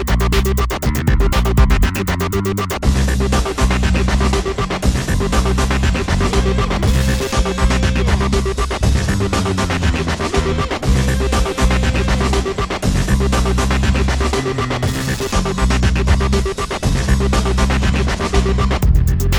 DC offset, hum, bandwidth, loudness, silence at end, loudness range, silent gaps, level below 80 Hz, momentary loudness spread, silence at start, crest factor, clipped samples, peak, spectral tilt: under 0.1%; none; over 20 kHz; -17 LUFS; 0 s; 1 LU; none; -18 dBFS; 3 LU; 0 s; 14 dB; under 0.1%; 0 dBFS; -5.5 dB/octave